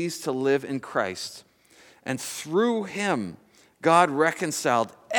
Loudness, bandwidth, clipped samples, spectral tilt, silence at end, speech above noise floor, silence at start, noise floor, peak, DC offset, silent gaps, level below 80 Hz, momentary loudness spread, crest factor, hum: -25 LUFS; 19 kHz; under 0.1%; -4 dB/octave; 0 s; 31 dB; 0 s; -56 dBFS; -4 dBFS; under 0.1%; none; -74 dBFS; 13 LU; 20 dB; none